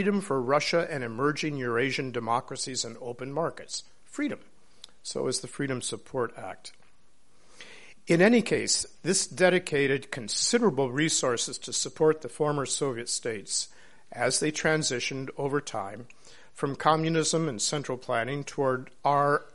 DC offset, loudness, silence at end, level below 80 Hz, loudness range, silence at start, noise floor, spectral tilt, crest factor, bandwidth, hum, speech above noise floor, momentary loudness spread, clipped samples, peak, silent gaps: 0.4%; -28 LUFS; 0.1 s; -64 dBFS; 8 LU; 0 s; -65 dBFS; -3.5 dB/octave; 22 dB; 11.5 kHz; none; 37 dB; 13 LU; under 0.1%; -8 dBFS; none